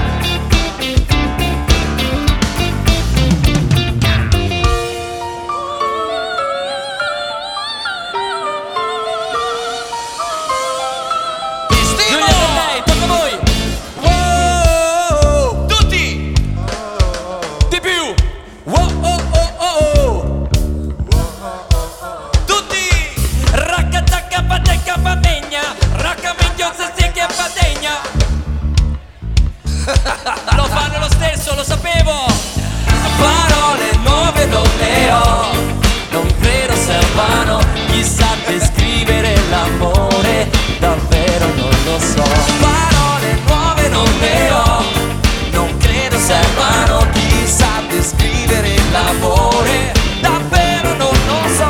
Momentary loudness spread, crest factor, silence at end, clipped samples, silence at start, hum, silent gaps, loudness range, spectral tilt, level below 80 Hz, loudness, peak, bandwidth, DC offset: 8 LU; 14 dB; 0 s; under 0.1%; 0 s; none; none; 5 LU; -4 dB/octave; -18 dBFS; -14 LUFS; 0 dBFS; 17.5 kHz; under 0.1%